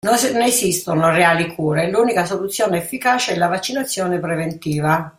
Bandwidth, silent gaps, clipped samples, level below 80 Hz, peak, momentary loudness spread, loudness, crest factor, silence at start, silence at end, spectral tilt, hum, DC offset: 16.5 kHz; none; under 0.1%; -54 dBFS; -2 dBFS; 7 LU; -18 LUFS; 16 dB; 0.05 s; 0.1 s; -4 dB/octave; none; under 0.1%